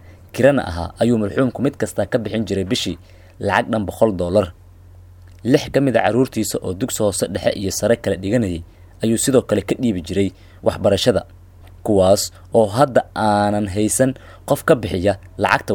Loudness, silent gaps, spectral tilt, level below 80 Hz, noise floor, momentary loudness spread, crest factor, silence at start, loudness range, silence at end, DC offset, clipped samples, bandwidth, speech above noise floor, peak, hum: -19 LUFS; none; -5 dB/octave; -44 dBFS; -43 dBFS; 8 LU; 18 dB; 0.1 s; 3 LU; 0 s; under 0.1%; under 0.1%; 19 kHz; 25 dB; 0 dBFS; none